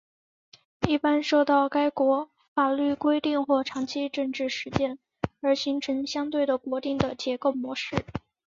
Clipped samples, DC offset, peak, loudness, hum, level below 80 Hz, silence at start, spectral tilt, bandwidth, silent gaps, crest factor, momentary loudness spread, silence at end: under 0.1%; under 0.1%; -4 dBFS; -26 LUFS; none; -54 dBFS; 0.8 s; -5.5 dB/octave; 7.6 kHz; 2.48-2.56 s; 22 dB; 8 LU; 0.3 s